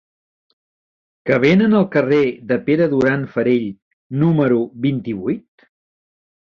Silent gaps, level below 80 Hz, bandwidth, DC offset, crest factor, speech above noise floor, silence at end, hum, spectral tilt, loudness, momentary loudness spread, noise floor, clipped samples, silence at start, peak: 3.82-4.10 s; -56 dBFS; 7 kHz; under 0.1%; 16 dB; over 74 dB; 1.1 s; none; -8.5 dB/octave; -17 LUFS; 11 LU; under -90 dBFS; under 0.1%; 1.25 s; -2 dBFS